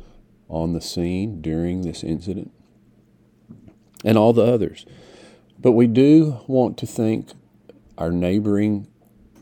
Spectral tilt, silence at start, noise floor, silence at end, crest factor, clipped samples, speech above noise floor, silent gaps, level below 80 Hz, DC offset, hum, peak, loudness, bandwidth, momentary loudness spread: -7.5 dB/octave; 0.5 s; -56 dBFS; 0.55 s; 20 dB; under 0.1%; 37 dB; none; -48 dBFS; under 0.1%; none; -2 dBFS; -20 LUFS; 18 kHz; 14 LU